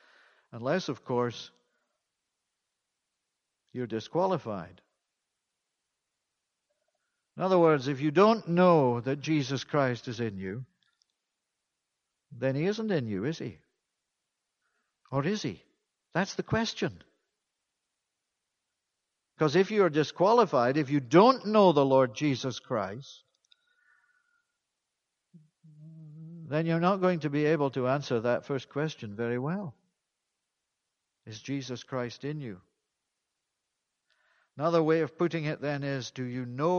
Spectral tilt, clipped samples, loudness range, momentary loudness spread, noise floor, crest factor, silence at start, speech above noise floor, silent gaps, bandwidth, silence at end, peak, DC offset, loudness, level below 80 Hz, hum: -6.5 dB/octave; under 0.1%; 14 LU; 16 LU; -85 dBFS; 24 dB; 0.55 s; 57 dB; none; 7.2 kHz; 0 s; -8 dBFS; under 0.1%; -28 LUFS; -68 dBFS; none